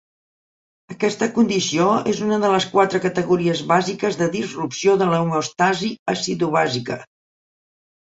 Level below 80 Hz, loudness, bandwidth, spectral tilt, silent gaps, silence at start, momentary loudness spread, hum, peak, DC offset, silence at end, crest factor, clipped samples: -60 dBFS; -20 LUFS; 8 kHz; -5 dB/octave; 5.99-6.06 s; 0.9 s; 6 LU; none; -2 dBFS; under 0.1%; 1.05 s; 18 dB; under 0.1%